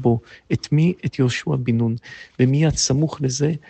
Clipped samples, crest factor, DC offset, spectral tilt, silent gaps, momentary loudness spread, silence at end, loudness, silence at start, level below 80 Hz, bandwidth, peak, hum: under 0.1%; 14 dB; under 0.1%; -5.5 dB/octave; none; 8 LU; 0.1 s; -20 LUFS; 0 s; -46 dBFS; 8.8 kHz; -6 dBFS; none